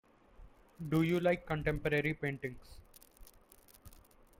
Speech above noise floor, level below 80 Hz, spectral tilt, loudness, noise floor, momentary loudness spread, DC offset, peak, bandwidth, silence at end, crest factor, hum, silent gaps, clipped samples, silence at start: 28 dB; -54 dBFS; -7 dB/octave; -34 LUFS; -62 dBFS; 14 LU; under 0.1%; -20 dBFS; 16.5 kHz; 0.4 s; 18 dB; none; none; under 0.1%; 0.4 s